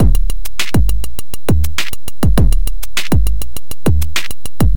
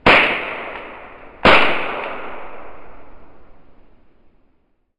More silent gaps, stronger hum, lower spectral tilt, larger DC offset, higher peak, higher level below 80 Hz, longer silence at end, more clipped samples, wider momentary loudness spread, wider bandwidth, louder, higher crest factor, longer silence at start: neither; neither; about the same, -5 dB/octave vs -5 dB/octave; first, 30% vs under 0.1%; about the same, 0 dBFS vs 0 dBFS; first, -18 dBFS vs -42 dBFS; second, 0 s vs 1.15 s; neither; second, 9 LU vs 26 LU; first, 17.5 kHz vs 10.5 kHz; second, -18 LUFS vs -15 LUFS; second, 14 dB vs 20 dB; about the same, 0 s vs 0.05 s